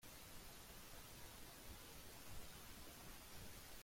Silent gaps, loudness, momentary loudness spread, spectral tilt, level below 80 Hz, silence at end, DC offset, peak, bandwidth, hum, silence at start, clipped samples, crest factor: none; -58 LUFS; 1 LU; -2.5 dB/octave; -64 dBFS; 0 s; under 0.1%; -40 dBFS; 16.5 kHz; none; 0 s; under 0.1%; 16 dB